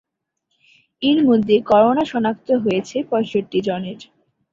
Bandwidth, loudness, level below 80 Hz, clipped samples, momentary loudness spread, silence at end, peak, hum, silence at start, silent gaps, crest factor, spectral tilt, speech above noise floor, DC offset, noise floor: 7.6 kHz; -18 LUFS; -58 dBFS; under 0.1%; 10 LU; 0.5 s; -2 dBFS; none; 1 s; none; 16 dB; -6.5 dB/octave; 57 dB; under 0.1%; -74 dBFS